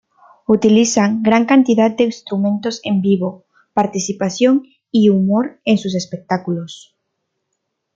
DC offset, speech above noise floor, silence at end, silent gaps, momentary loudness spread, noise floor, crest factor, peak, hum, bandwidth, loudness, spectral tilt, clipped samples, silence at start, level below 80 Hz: under 0.1%; 59 dB; 1.2 s; none; 10 LU; -74 dBFS; 16 dB; 0 dBFS; none; 7.8 kHz; -16 LUFS; -5.5 dB/octave; under 0.1%; 0.5 s; -58 dBFS